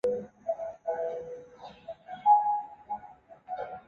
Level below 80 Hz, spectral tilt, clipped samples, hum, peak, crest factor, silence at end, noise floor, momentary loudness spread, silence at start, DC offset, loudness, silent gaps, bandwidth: -70 dBFS; -6 dB/octave; under 0.1%; none; -12 dBFS; 20 dB; 0.05 s; -52 dBFS; 21 LU; 0.05 s; under 0.1%; -31 LUFS; none; 6.8 kHz